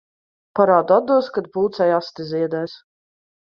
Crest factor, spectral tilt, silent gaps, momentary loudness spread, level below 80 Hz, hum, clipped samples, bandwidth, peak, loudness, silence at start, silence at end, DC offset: 18 dB; -7.5 dB/octave; none; 12 LU; -66 dBFS; none; under 0.1%; 6.6 kHz; -2 dBFS; -19 LUFS; 0.55 s; 0.7 s; under 0.1%